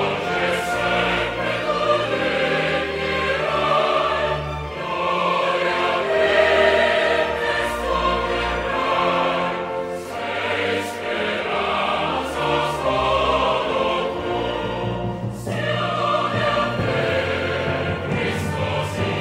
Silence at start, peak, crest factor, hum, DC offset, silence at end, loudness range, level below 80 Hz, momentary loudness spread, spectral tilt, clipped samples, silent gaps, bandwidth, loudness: 0 s; -4 dBFS; 16 dB; none; under 0.1%; 0 s; 4 LU; -42 dBFS; 7 LU; -5 dB/octave; under 0.1%; none; 16 kHz; -21 LUFS